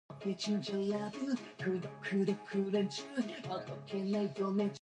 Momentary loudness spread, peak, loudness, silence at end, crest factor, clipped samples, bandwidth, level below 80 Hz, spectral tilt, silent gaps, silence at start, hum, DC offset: 6 LU; -22 dBFS; -37 LUFS; 0 s; 14 dB; under 0.1%; 10 kHz; -78 dBFS; -6 dB/octave; none; 0.1 s; none; under 0.1%